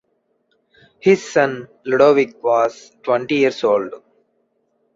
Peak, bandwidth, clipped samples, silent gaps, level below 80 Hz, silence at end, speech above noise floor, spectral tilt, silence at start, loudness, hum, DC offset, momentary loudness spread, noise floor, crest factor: -2 dBFS; 7.8 kHz; under 0.1%; none; -64 dBFS; 1 s; 50 dB; -5.5 dB/octave; 1.05 s; -17 LUFS; none; under 0.1%; 9 LU; -67 dBFS; 18 dB